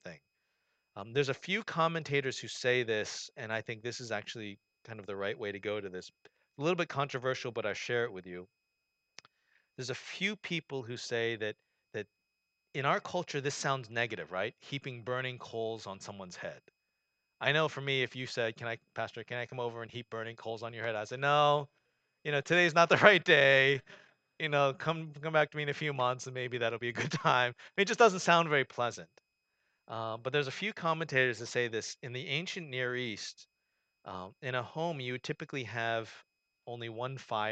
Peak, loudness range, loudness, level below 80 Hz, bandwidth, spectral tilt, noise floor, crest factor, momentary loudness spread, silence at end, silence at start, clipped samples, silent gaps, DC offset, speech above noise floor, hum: -4 dBFS; 12 LU; -32 LUFS; -80 dBFS; 9 kHz; -4 dB/octave; -84 dBFS; 30 dB; 17 LU; 0 s; 0.05 s; under 0.1%; none; under 0.1%; 51 dB; none